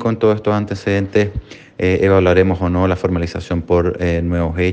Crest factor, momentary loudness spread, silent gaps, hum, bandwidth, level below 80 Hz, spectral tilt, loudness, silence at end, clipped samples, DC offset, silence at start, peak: 16 dB; 9 LU; none; none; 8.4 kHz; -34 dBFS; -8 dB/octave; -16 LUFS; 0 s; under 0.1%; under 0.1%; 0 s; 0 dBFS